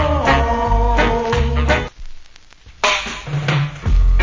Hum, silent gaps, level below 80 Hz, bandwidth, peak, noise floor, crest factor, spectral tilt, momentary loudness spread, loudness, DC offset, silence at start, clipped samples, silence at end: none; none; -20 dBFS; 7.6 kHz; 0 dBFS; -42 dBFS; 16 dB; -5 dB/octave; 5 LU; -17 LUFS; under 0.1%; 0 s; under 0.1%; 0 s